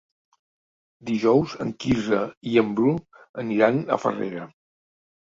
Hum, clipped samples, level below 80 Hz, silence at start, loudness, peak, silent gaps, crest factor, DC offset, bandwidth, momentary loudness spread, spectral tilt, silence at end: none; under 0.1%; -54 dBFS; 1.05 s; -23 LUFS; -4 dBFS; 2.37-2.41 s, 3.29-3.34 s; 22 dB; under 0.1%; 7.8 kHz; 14 LU; -7 dB/octave; 0.85 s